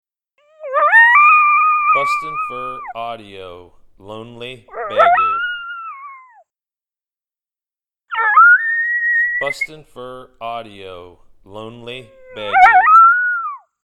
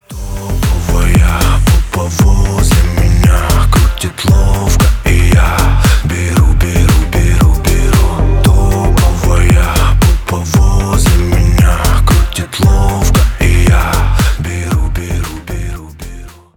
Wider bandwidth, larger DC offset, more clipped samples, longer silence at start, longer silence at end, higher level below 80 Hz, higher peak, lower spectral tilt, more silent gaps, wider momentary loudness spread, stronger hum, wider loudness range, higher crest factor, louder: second, 12 kHz vs 19 kHz; neither; neither; first, 0.6 s vs 0.1 s; about the same, 0.3 s vs 0.25 s; second, -56 dBFS vs -12 dBFS; about the same, 0 dBFS vs 0 dBFS; second, -3 dB/octave vs -5.5 dB/octave; neither; first, 26 LU vs 7 LU; neither; first, 9 LU vs 2 LU; first, 16 dB vs 8 dB; about the same, -12 LUFS vs -11 LUFS